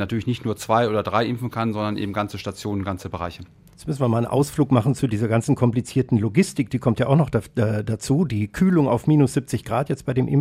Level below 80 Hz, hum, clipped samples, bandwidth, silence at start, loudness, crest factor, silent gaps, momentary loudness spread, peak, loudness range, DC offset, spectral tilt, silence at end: -48 dBFS; none; under 0.1%; 15.5 kHz; 0 s; -22 LUFS; 18 dB; none; 9 LU; -4 dBFS; 5 LU; under 0.1%; -7 dB/octave; 0 s